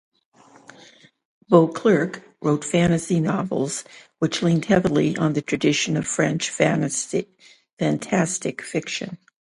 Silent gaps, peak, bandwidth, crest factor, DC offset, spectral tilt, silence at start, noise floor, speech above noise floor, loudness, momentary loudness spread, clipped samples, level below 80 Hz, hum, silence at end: 7.73-7.77 s; 0 dBFS; 11.5 kHz; 22 dB; under 0.1%; -5 dB/octave; 1.5 s; -51 dBFS; 30 dB; -22 LUFS; 10 LU; under 0.1%; -56 dBFS; none; 0.4 s